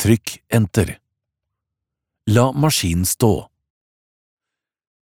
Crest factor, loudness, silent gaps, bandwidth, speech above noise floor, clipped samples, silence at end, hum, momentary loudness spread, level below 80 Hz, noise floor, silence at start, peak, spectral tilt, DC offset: 20 dB; -18 LUFS; none; 20 kHz; 68 dB; under 0.1%; 1.6 s; none; 9 LU; -42 dBFS; -85 dBFS; 0 s; 0 dBFS; -5 dB/octave; under 0.1%